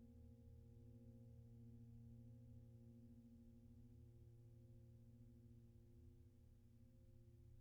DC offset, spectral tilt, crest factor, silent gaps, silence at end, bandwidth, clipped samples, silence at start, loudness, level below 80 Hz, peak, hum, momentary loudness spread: under 0.1%; -12.5 dB/octave; 12 dB; none; 0 s; 3.6 kHz; under 0.1%; 0 s; -66 LUFS; -72 dBFS; -52 dBFS; none; 5 LU